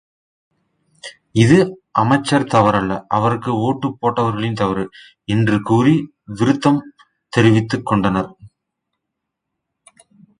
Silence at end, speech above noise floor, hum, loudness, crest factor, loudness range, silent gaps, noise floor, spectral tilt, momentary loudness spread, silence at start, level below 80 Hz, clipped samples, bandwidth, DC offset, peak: 1.95 s; 63 dB; none; -17 LUFS; 18 dB; 3 LU; none; -79 dBFS; -7 dB/octave; 10 LU; 1.05 s; -48 dBFS; under 0.1%; 10.5 kHz; under 0.1%; 0 dBFS